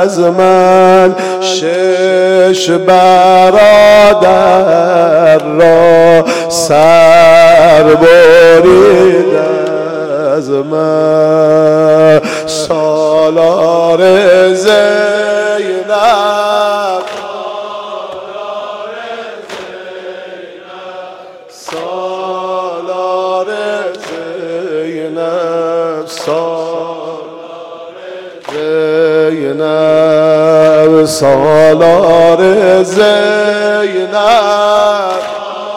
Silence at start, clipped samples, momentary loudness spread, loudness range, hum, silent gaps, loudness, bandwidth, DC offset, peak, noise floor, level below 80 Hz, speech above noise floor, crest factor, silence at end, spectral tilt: 0 s; under 0.1%; 19 LU; 15 LU; none; none; -8 LUFS; 15.5 kHz; under 0.1%; 0 dBFS; -32 dBFS; -46 dBFS; 26 dB; 8 dB; 0 s; -4.5 dB/octave